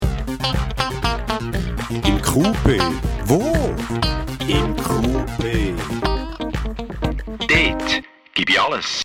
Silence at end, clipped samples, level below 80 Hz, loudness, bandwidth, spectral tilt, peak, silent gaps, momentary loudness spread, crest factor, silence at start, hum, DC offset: 0 s; under 0.1%; -28 dBFS; -20 LUFS; 17.5 kHz; -5 dB/octave; 0 dBFS; none; 9 LU; 20 dB; 0 s; none; under 0.1%